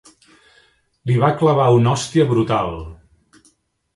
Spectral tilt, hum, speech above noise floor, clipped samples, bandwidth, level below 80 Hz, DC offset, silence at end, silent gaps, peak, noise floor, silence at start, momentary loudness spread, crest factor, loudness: -7 dB/octave; none; 44 dB; under 0.1%; 11.5 kHz; -46 dBFS; under 0.1%; 1 s; none; -2 dBFS; -60 dBFS; 1.05 s; 16 LU; 18 dB; -17 LUFS